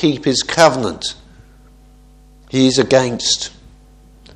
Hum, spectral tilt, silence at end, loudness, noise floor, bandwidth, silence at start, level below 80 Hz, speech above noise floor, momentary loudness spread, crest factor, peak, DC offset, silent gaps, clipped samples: none; -3.5 dB/octave; 0.85 s; -15 LUFS; -45 dBFS; 12.5 kHz; 0 s; -46 dBFS; 30 dB; 13 LU; 18 dB; 0 dBFS; under 0.1%; none; under 0.1%